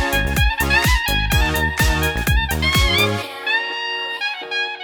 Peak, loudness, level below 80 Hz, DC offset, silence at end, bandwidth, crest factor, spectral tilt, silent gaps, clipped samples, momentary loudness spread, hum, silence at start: -4 dBFS; -18 LUFS; -24 dBFS; under 0.1%; 0 s; over 20 kHz; 16 dB; -3.5 dB/octave; none; under 0.1%; 7 LU; none; 0 s